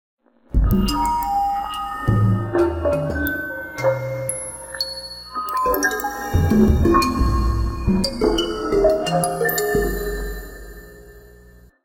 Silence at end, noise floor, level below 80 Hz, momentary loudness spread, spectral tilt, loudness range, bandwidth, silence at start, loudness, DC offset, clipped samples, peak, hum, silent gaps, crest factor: 0.6 s; -47 dBFS; -28 dBFS; 11 LU; -5.5 dB/octave; 4 LU; 17 kHz; 0.5 s; -21 LUFS; under 0.1%; under 0.1%; -2 dBFS; 60 Hz at -50 dBFS; none; 18 dB